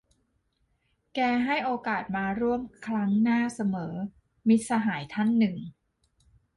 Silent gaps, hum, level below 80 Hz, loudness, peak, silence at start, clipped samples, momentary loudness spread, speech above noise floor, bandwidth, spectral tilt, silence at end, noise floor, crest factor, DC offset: none; none; -62 dBFS; -27 LUFS; -12 dBFS; 1.15 s; under 0.1%; 12 LU; 46 dB; 11.5 kHz; -6 dB/octave; 0.85 s; -73 dBFS; 16 dB; under 0.1%